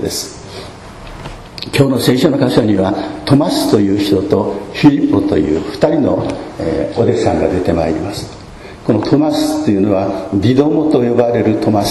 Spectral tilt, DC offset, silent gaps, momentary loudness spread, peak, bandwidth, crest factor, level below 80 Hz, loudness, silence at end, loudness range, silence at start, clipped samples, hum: -6.5 dB/octave; under 0.1%; none; 18 LU; 0 dBFS; 14 kHz; 14 dB; -38 dBFS; -14 LUFS; 0 s; 3 LU; 0 s; 0.2%; none